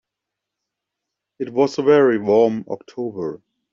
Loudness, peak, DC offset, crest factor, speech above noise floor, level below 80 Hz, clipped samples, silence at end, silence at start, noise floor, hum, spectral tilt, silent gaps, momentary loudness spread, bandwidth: -18 LUFS; -4 dBFS; under 0.1%; 18 dB; 65 dB; -66 dBFS; under 0.1%; 0.35 s; 1.4 s; -83 dBFS; none; -5.5 dB/octave; none; 15 LU; 7.4 kHz